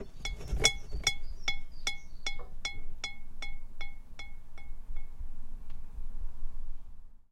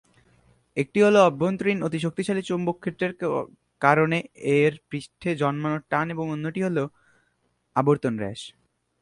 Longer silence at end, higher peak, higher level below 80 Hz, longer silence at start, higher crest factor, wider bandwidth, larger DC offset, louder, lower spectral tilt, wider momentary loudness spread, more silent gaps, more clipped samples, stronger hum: second, 0.1 s vs 0.5 s; second, -8 dBFS vs -2 dBFS; first, -38 dBFS vs -64 dBFS; second, 0 s vs 0.75 s; about the same, 24 dB vs 22 dB; about the same, 11.5 kHz vs 11 kHz; neither; second, -36 LUFS vs -24 LUFS; second, -1.5 dB/octave vs -6.5 dB/octave; first, 21 LU vs 13 LU; neither; neither; neither